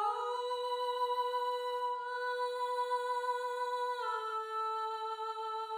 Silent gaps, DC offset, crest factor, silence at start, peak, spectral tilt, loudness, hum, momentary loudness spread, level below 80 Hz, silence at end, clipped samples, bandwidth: none; under 0.1%; 12 dB; 0 s; -24 dBFS; 1 dB/octave; -36 LUFS; none; 4 LU; -86 dBFS; 0 s; under 0.1%; 16 kHz